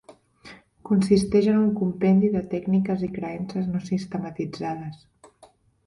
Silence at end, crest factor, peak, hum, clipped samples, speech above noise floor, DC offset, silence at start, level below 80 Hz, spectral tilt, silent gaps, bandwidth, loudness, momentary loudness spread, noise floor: 0.9 s; 18 dB; -6 dBFS; none; under 0.1%; 33 dB; under 0.1%; 0.1 s; -54 dBFS; -8 dB/octave; none; 11.5 kHz; -24 LUFS; 12 LU; -56 dBFS